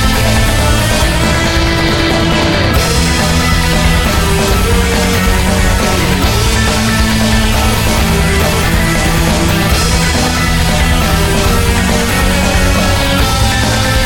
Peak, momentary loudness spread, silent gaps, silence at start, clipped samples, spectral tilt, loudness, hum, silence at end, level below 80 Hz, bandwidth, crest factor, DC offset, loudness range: 0 dBFS; 1 LU; none; 0 s; under 0.1%; -4 dB/octave; -11 LUFS; none; 0 s; -16 dBFS; 17.5 kHz; 10 dB; under 0.1%; 0 LU